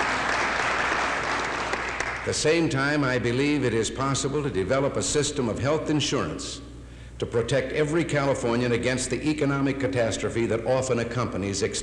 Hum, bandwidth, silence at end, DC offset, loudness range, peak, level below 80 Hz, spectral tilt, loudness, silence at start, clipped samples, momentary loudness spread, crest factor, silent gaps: none; 12 kHz; 0 s; under 0.1%; 2 LU; -12 dBFS; -46 dBFS; -4.5 dB/octave; -25 LUFS; 0 s; under 0.1%; 5 LU; 14 dB; none